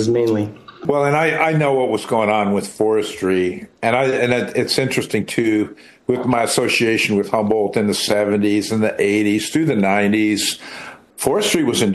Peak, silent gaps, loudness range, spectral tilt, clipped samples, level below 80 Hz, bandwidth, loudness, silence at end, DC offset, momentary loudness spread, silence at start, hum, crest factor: 0 dBFS; none; 2 LU; -4.5 dB/octave; under 0.1%; -56 dBFS; 12.5 kHz; -18 LUFS; 0 s; under 0.1%; 7 LU; 0 s; none; 16 dB